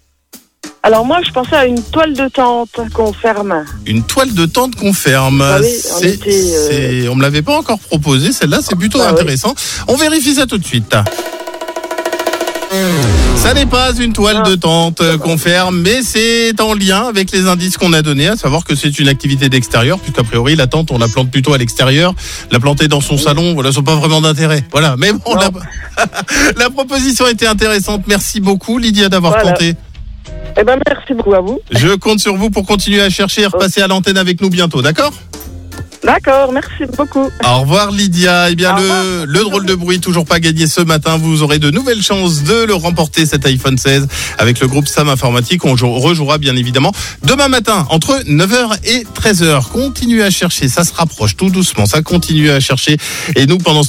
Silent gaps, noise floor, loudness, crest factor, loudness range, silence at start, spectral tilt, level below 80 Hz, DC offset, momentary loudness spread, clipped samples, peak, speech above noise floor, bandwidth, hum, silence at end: none; -41 dBFS; -11 LUFS; 12 dB; 2 LU; 0.35 s; -4.5 dB/octave; -28 dBFS; under 0.1%; 6 LU; under 0.1%; 0 dBFS; 30 dB; 17 kHz; none; 0 s